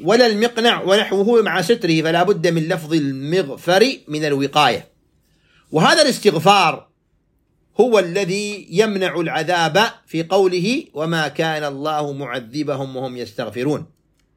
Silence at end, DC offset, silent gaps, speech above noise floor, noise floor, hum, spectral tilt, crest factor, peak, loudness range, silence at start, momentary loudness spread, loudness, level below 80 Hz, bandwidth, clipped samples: 0.5 s; under 0.1%; none; 46 dB; -64 dBFS; none; -4.5 dB/octave; 18 dB; 0 dBFS; 4 LU; 0 s; 11 LU; -18 LUFS; -64 dBFS; 16.5 kHz; under 0.1%